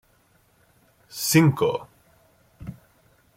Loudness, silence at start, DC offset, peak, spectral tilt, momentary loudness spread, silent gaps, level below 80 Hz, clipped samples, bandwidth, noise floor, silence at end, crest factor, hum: -21 LUFS; 1.15 s; under 0.1%; -4 dBFS; -5 dB/octave; 23 LU; none; -60 dBFS; under 0.1%; 16.5 kHz; -62 dBFS; 0.65 s; 22 dB; none